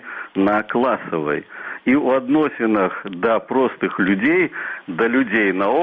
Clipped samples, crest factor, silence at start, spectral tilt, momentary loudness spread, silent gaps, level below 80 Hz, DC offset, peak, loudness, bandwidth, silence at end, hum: under 0.1%; 14 dB; 0.05 s; -9 dB/octave; 8 LU; none; -58 dBFS; under 0.1%; -6 dBFS; -19 LUFS; 4.6 kHz; 0 s; none